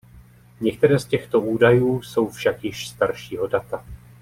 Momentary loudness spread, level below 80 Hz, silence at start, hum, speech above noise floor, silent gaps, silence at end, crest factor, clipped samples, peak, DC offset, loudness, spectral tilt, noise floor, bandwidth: 12 LU; -50 dBFS; 0.15 s; none; 27 dB; none; 0.25 s; 18 dB; under 0.1%; -4 dBFS; under 0.1%; -21 LUFS; -6.5 dB/octave; -48 dBFS; 16 kHz